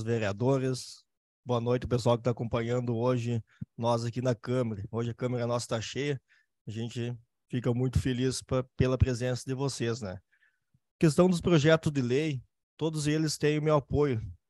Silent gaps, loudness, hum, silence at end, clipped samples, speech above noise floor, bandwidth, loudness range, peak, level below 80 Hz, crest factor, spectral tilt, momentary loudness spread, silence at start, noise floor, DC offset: 1.17-1.43 s, 6.61-6.65 s, 10.91-10.99 s, 12.63-12.77 s; -30 LUFS; none; 0.15 s; under 0.1%; 42 dB; 12.5 kHz; 5 LU; -10 dBFS; -50 dBFS; 18 dB; -6.5 dB/octave; 12 LU; 0 s; -71 dBFS; under 0.1%